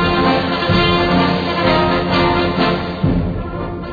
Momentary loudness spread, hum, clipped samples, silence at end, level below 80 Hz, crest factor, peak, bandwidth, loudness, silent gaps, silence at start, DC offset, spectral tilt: 7 LU; none; under 0.1%; 0 s; -30 dBFS; 12 dB; -2 dBFS; 5 kHz; -15 LUFS; none; 0 s; under 0.1%; -7.5 dB/octave